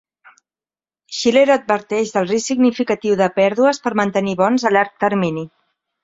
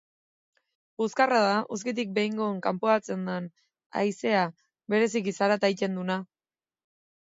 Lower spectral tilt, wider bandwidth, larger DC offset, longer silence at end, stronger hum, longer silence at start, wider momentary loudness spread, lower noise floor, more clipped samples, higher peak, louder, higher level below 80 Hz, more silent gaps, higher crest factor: about the same, -5 dB/octave vs -5 dB/octave; about the same, 7.8 kHz vs 7.8 kHz; neither; second, 0.55 s vs 1.15 s; neither; about the same, 1.1 s vs 1 s; second, 6 LU vs 9 LU; about the same, under -90 dBFS vs under -90 dBFS; neither; first, -2 dBFS vs -8 dBFS; first, -17 LUFS vs -27 LUFS; first, -60 dBFS vs -78 dBFS; second, none vs 3.86-3.90 s; about the same, 16 dB vs 20 dB